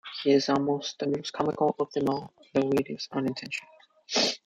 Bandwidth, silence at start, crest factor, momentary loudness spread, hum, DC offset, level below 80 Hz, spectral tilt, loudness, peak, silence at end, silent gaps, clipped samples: 15 kHz; 0.05 s; 18 dB; 9 LU; none; under 0.1%; -68 dBFS; -4.5 dB/octave; -28 LUFS; -10 dBFS; 0.1 s; none; under 0.1%